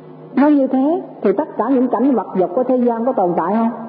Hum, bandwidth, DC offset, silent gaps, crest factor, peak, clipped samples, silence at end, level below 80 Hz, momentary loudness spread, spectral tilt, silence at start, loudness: none; 4.7 kHz; under 0.1%; none; 14 dB; -2 dBFS; under 0.1%; 0 s; -70 dBFS; 5 LU; -13 dB/octave; 0 s; -16 LUFS